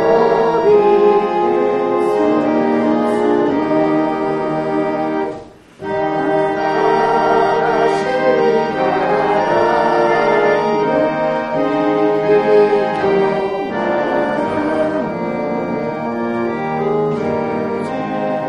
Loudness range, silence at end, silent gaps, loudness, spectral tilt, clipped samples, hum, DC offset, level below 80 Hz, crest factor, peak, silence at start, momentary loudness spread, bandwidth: 4 LU; 0 s; none; -16 LUFS; -7 dB/octave; under 0.1%; none; under 0.1%; -50 dBFS; 14 dB; -2 dBFS; 0 s; 8 LU; 9.8 kHz